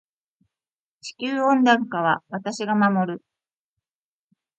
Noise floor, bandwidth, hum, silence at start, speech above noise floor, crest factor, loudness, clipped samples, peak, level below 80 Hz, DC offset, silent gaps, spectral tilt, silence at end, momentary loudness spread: under -90 dBFS; 8.8 kHz; none; 1.05 s; over 69 dB; 20 dB; -22 LUFS; under 0.1%; -4 dBFS; -74 dBFS; under 0.1%; none; -5.5 dB/octave; 1.4 s; 17 LU